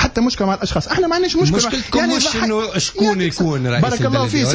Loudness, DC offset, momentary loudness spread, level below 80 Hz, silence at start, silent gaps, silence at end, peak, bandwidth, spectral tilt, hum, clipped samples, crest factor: -17 LUFS; under 0.1%; 3 LU; -36 dBFS; 0 s; none; 0 s; -4 dBFS; 8 kHz; -4.5 dB/octave; none; under 0.1%; 14 dB